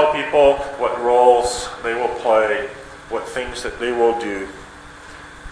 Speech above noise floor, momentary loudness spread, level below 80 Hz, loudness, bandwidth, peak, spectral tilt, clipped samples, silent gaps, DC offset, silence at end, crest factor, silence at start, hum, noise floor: 21 dB; 23 LU; -44 dBFS; -18 LUFS; 11 kHz; -2 dBFS; -3.5 dB/octave; under 0.1%; none; under 0.1%; 0 s; 18 dB; 0 s; none; -39 dBFS